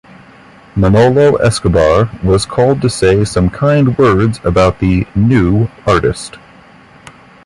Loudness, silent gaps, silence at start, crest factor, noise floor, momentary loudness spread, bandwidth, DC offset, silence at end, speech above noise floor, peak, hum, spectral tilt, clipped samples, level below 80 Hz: -11 LUFS; none; 0.75 s; 12 dB; -40 dBFS; 5 LU; 11.5 kHz; under 0.1%; 1.1 s; 30 dB; 0 dBFS; none; -6.5 dB/octave; under 0.1%; -28 dBFS